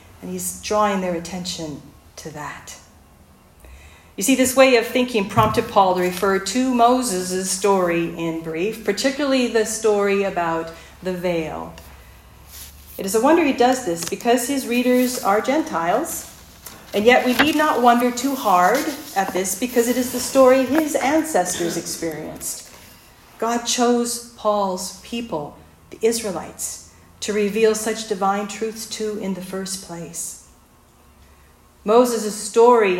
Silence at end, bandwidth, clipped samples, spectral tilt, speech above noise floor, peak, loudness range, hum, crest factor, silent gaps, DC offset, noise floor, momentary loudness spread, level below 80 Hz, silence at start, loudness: 0 s; 16.5 kHz; under 0.1%; -3.5 dB/octave; 32 dB; 0 dBFS; 8 LU; none; 20 dB; none; under 0.1%; -52 dBFS; 16 LU; -52 dBFS; 0.2 s; -20 LUFS